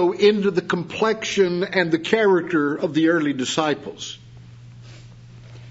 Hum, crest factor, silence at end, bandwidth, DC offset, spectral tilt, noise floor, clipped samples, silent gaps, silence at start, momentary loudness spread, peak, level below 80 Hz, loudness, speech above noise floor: none; 18 dB; 0 s; 8 kHz; under 0.1%; -5 dB/octave; -42 dBFS; under 0.1%; none; 0 s; 10 LU; -2 dBFS; -60 dBFS; -20 LUFS; 22 dB